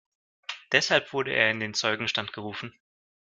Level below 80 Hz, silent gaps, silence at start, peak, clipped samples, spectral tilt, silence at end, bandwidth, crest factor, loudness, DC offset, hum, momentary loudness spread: -70 dBFS; none; 0.5 s; -4 dBFS; under 0.1%; -2.5 dB/octave; 0.65 s; 10 kHz; 26 dB; -25 LUFS; under 0.1%; none; 17 LU